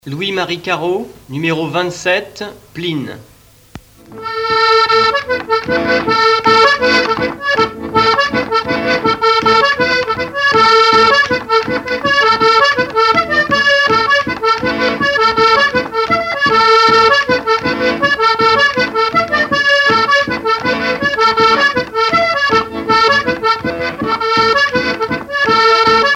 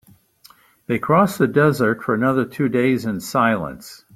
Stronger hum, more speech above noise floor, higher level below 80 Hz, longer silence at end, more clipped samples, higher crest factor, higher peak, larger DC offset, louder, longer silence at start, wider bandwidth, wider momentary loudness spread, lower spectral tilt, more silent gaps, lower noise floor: neither; second, 23 dB vs 33 dB; first, -44 dBFS vs -56 dBFS; second, 0 s vs 0.2 s; neither; second, 12 dB vs 18 dB; about the same, 0 dBFS vs -2 dBFS; neither; first, -12 LUFS vs -19 LUFS; second, 0.05 s vs 0.9 s; about the same, 16 kHz vs 16 kHz; about the same, 9 LU vs 8 LU; second, -3.5 dB/octave vs -6.5 dB/octave; neither; second, -37 dBFS vs -52 dBFS